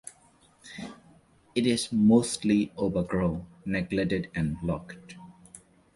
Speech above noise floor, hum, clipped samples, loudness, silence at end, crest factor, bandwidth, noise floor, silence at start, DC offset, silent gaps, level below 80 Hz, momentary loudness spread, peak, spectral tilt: 34 dB; none; under 0.1%; -27 LUFS; 0.4 s; 20 dB; 11.5 kHz; -61 dBFS; 0.05 s; under 0.1%; none; -52 dBFS; 23 LU; -10 dBFS; -5.5 dB/octave